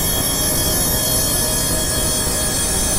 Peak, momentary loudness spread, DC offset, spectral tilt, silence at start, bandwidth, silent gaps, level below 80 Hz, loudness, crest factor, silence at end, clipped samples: -4 dBFS; 2 LU; under 0.1%; -2.5 dB/octave; 0 s; 16 kHz; none; -28 dBFS; -16 LUFS; 14 dB; 0 s; under 0.1%